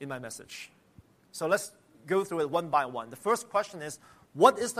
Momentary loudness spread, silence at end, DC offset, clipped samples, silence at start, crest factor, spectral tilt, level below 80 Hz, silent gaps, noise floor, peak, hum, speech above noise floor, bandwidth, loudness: 21 LU; 0 s; under 0.1%; under 0.1%; 0 s; 24 dB; -4 dB/octave; -74 dBFS; none; -59 dBFS; -6 dBFS; none; 30 dB; 15.5 kHz; -29 LUFS